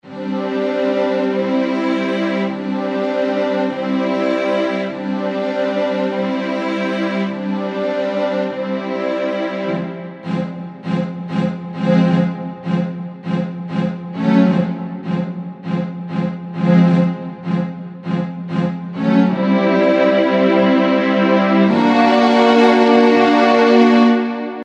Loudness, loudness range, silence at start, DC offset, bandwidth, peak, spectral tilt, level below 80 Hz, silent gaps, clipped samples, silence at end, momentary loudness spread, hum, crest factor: -17 LUFS; 8 LU; 0.05 s; under 0.1%; 8.2 kHz; -2 dBFS; -7.5 dB/octave; -60 dBFS; none; under 0.1%; 0 s; 11 LU; none; 16 dB